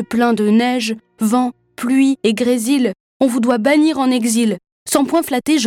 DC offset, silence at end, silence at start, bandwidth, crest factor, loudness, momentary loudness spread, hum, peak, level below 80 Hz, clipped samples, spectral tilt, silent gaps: under 0.1%; 0 s; 0 s; 17 kHz; 14 dB; -16 LUFS; 7 LU; none; -2 dBFS; -60 dBFS; under 0.1%; -4 dB/octave; 3.00-3.20 s, 4.72-4.86 s